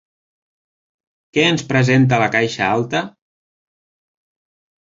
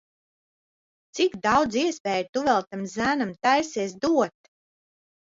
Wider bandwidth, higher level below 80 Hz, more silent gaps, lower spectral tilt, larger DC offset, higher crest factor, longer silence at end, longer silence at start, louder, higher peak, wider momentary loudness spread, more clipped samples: about the same, 7.8 kHz vs 7.8 kHz; first, -54 dBFS vs -62 dBFS; second, none vs 2.00-2.04 s, 2.29-2.33 s; first, -5.5 dB/octave vs -4 dB/octave; neither; about the same, 18 dB vs 18 dB; first, 1.75 s vs 1.1 s; first, 1.35 s vs 1.15 s; first, -16 LUFS vs -24 LUFS; first, -2 dBFS vs -8 dBFS; about the same, 9 LU vs 7 LU; neither